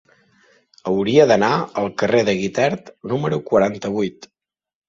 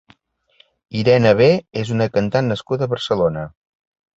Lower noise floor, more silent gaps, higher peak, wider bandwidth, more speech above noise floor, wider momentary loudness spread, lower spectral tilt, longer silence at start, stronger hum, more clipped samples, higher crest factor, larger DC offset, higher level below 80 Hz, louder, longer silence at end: about the same, -57 dBFS vs -57 dBFS; neither; about the same, -2 dBFS vs -2 dBFS; about the same, 7.6 kHz vs 7.8 kHz; about the same, 39 dB vs 40 dB; about the same, 11 LU vs 11 LU; about the same, -6 dB/octave vs -7 dB/octave; about the same, 0.85 s vs 0.9 s; neither; neither; about the same, 18 dB vs 18 dB; neither; second, -56 dBFS vs -50 dBFS; about the same, -19 LUFS vs -18 LUFS; about the same, 0.65 s vs 0.7 s